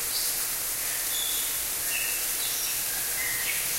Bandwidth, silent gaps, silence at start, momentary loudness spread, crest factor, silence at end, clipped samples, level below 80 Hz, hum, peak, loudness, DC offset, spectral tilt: 16 kHz; none; 0 s; 1 LU; 16 dB; 0 s; under 0.1%; -54 dBFS; none; -14 dBFS; -26 LUFS; under 0.1%; 1.5 dB/octave